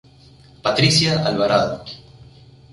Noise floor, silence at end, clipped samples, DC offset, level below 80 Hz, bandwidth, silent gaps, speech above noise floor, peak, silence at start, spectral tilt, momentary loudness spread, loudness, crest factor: -48 dBFS; 0.75 s; under 0.1%; under 0.1%; -48 dBFS; 11.5 kHz; none; 30 dB; -2 dBFS; 0.65 s; -4.5 dB/octave; 19 LU; -17 LUFS; 18 dB